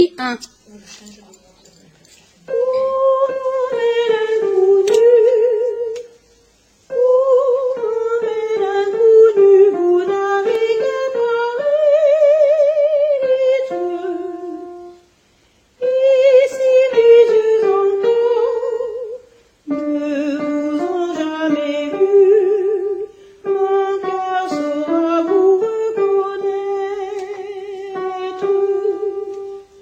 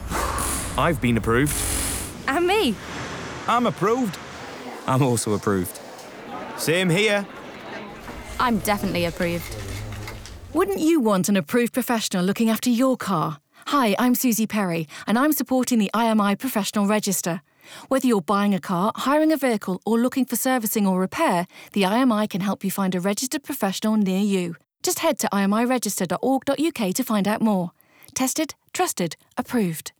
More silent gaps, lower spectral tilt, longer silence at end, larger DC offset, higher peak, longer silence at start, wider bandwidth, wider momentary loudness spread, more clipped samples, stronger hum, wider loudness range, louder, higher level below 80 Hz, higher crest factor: neither; about the same, -4.5 dB/octave vs -4.5 dB/octave; about the same, 0.2 s vs 0.1 s; neither; first, -2 dBFS vs -10 dBFS; about the same, 0 s vs 0 s; second, 8.6 kHz vs over 20 kHz; about the same, 15 LU vs 13 LU; neither; neither; first, 7 LU vs 3 LU; first, -15 LUFS vs -22 LUFS; second, -64 dBFS vs -44 dBFS; about the same, 14 dB vs 12 dB